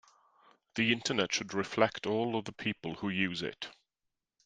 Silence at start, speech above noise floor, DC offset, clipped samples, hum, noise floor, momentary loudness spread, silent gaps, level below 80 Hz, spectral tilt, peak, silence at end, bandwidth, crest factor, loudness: 0.75 s; 54 dB; under 0.1%; under 0.1%; none; -87 dBFS; 10 LU; none; -70 dBFS; -4 dB/octave; -8 dBFS; 0.75 s; 9.6 kHz; 26 dB; -33 LUFS